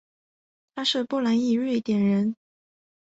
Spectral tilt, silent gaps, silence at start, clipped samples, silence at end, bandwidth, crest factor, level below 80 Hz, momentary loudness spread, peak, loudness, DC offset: -6 dB/octave; none; 0.75 s; under 0.1%; 0.75 s; 8 kHz; 16 dB; -70 dBFS; 8 LU; -10 dBFS; -24 LUFS; under 0.1%